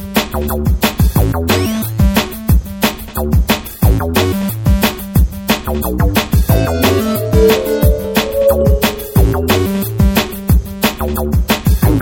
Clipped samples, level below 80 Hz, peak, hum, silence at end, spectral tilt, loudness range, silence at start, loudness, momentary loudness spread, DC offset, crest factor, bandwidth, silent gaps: under 0.1%; -18 dBFS; 0 dBFS; none; 0 s; -5.5 dB/octave; 2 LU; 0 s; -14 LUFS; 5 LU; under 0.1%; 12 dB; 17.5 kHz; none